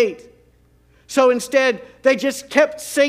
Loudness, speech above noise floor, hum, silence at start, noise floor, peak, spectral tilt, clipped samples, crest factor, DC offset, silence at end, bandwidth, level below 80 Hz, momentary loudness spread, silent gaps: -18 LUFS; 37 dB; none; 0 s; -55 dBFS; 0 dBFS; -2.5 dB/octave; under 0.1%; 18 dB; under 0.1%; 0 s; 16 kHz; -60 dBFS; 5 LU; none